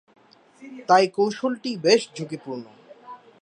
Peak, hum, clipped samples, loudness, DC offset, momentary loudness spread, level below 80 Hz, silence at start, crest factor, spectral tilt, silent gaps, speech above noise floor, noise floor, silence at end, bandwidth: -4 dBFS; none; under 0.1%; -22 LUFS; under 0.1%; 23 LU; -78 dBFS; 0.6 s; 22 dB; -4 dB/octave; none; 22 dB; -45 dBFS; 0.25 s; 10 kHz